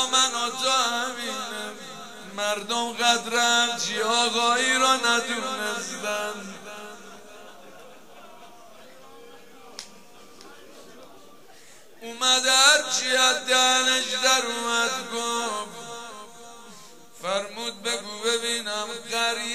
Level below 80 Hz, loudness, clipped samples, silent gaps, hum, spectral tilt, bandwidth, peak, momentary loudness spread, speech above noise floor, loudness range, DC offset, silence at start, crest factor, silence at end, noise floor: -74 dBFS; -22 LUFS; under 0.1%; none; none; 0.5 dB/octave; 15.5 kHz; -2 dBFS; 21 LU; 27 dB; 13 LU; 0.3%; 0 s; 24 dB; 0 s; -51 dBFS